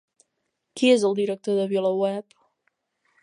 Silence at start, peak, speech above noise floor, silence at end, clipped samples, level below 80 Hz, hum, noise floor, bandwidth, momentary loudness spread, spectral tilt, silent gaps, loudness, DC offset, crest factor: 0.75 s; -6 dBFS; 56 dB; 1 s; under 0.1%; -80 dBFS; none; -78 dBFS; 11 kHz; 11 LU; -5 dB/octave; none; -23 LUFS; under 0.1%; 18 dB